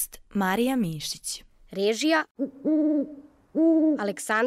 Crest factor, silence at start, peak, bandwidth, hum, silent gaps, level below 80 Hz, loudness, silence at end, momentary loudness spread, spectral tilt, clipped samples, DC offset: 14 dB; 0 s; -12 dBFS; 15.5 kHz; none; 2.31-2.35 s; -58 dBFS; -25 LUFS; 0 s; 11 LU; -4.5 dB/octave; under 0.1%; under 0.1%